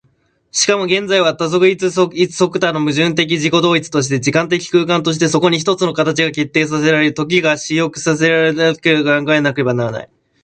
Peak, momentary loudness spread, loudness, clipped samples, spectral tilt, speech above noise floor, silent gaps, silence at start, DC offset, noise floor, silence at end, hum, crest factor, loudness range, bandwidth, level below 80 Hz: 0 dBFS; 3 LU; -14 LUFS; under 0.1%; -4.5 dB/octave; 45 dB; none; 0.55 s; under 0.1%; -59 dBFS; 0.4 s; none; 14 dB; 1 LU; 9.4 kHz; -56 dBFS